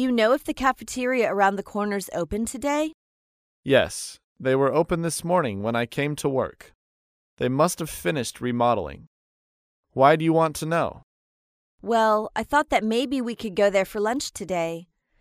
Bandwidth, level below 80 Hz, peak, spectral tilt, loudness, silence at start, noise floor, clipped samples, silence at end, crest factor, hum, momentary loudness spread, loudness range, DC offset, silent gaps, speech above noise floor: 15.5 kHz; -52 dBFS; -4 dBFS; -5 dB/octave; -24 LUFS; 0 s; under -90 dBFS; under 0.1%; 0.4 s; 20 dB; none; 9 LU; 3 LU; under 0.1%; 2.94-3.63 s, 4.24-4.36 s, 6.75-7.37 s, 9.07-9.83 s, 11.03-11.78 s; over 67 dB